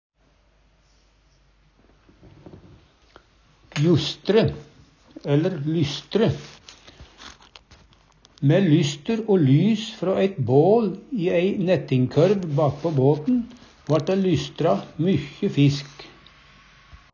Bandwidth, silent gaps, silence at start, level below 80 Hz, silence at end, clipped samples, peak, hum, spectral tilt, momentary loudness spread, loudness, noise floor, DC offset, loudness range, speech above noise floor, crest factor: 7.2 kHz; none; 3.75 s; -54 dBFS; 0.2 s; under 0.1%; -6 dBFS; none; -7.5 dB/octave; 16 LU; -21 LUFS; -61 dBFS; under 0.1%; 6 LU; 40 dB; 18 dB